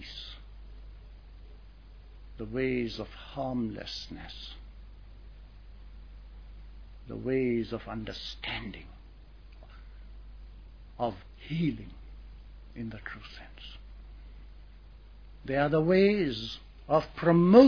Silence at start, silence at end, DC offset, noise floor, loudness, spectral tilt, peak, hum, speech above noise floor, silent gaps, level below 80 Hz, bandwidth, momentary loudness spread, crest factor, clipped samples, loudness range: 0 s; 0 s; under 0.1%; -50 dBFS; -31 LUFS; -8 dB/octave; -6 dBFS; none; 23 dB; none; -48 dBFS; 5.4 kHz; 26 LU; 26 dB; under 0.1%; 14 LU